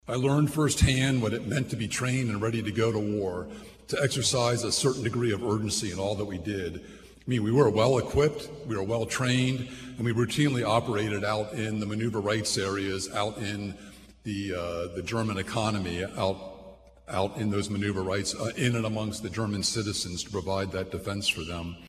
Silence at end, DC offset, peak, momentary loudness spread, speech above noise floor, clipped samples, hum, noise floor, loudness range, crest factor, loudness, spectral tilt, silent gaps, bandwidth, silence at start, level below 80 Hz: 0 s; under 0.1%; -8 dBFS; 10 LU; 22 dB; under 0.1%; none; -50 dBFS; 5 LU; 20 dB; -28 LUFS; -5 dB/octave; none; 14 kHz; 0.05 s; -46 dBFS